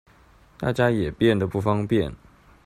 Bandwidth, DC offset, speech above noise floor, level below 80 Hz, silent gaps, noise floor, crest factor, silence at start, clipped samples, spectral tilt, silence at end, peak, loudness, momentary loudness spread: 14 kHz; under 0.1%; 32 dB; -48 dBFS; none; -54 dBFS; 18 dB; 0.6 s; under 0.1%; -7.5 dB/octave; 0.5 s; -6 dBFS; -23 LUFS; 7 LU